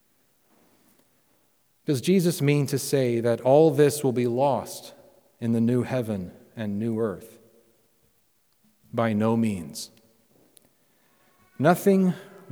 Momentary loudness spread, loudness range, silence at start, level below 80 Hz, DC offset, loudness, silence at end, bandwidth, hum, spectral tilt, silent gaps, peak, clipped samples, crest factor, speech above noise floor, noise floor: 17 LU; 8 LU; 1.9 s; -68 dBFS; under 0.1%; -24 LUFS; 0.25 s; over 20 kHz; none; -6.5 dB/octave; none; -6 dBFS; under 0.1%; 20 dB; 45 dB; -68 dBFS